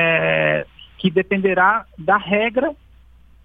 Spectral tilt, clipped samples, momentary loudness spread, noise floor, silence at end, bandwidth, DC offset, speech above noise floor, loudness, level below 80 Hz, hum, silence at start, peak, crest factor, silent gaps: -8.5 dB/octave; under 0.1%; 8 LU; -48 dBFS; 0.7 s; 4.6 kHz; under 0.1%; 30 dB; -18 LUFS; -50 dBFS; none; 0 s; -2 dBFS; 18 dB; none